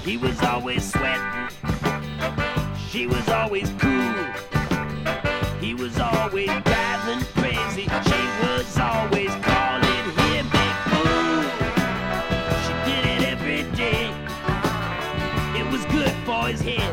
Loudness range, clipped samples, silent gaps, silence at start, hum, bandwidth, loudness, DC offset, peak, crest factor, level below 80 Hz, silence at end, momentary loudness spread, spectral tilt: 3 LU; under 0.1%; none; 0 s; none; 18 kHz; -23 LUFS; under 0.1%; -4 dBFS; 20 dB; -36 dBFS; 0 s; 6 LU; -5 dB/octave